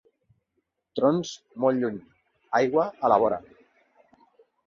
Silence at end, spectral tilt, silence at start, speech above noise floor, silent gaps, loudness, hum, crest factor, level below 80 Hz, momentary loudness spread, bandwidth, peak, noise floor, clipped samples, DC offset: 1.25 s; -6 dB/octave; 0.95 s; 53 dB; none; -25 LUFS; none; 22 dB; -66 dBFS; 14 LU; 7.6 kHz; -6 dBFS; -77 dBFS; under 0.1%; under 0.1%